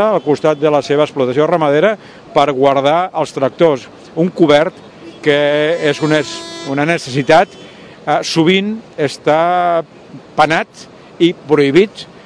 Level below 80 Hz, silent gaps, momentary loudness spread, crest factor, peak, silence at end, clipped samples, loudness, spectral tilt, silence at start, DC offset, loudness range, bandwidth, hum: -54 dBFS; none; 9 LU; 14 dB; 0 dBFS; 0.2 s; 0.3%; -14 LUFS; -5.5 dB/octave; 0 s; under 0.1%; 2 LU; 11 kHz; none